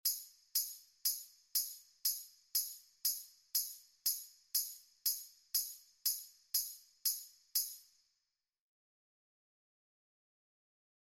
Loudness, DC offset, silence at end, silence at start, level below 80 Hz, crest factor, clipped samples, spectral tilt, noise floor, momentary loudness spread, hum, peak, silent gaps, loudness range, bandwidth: -38 LUFS; under 0.1%; 3.25 s; 0.05 s; -84 dBFS; 22 dB; under 0.1%; 5.5 dB/octave; -88 dBFS; 7 LU; none; -20 dBFS; none; 5 LU; 17 kHz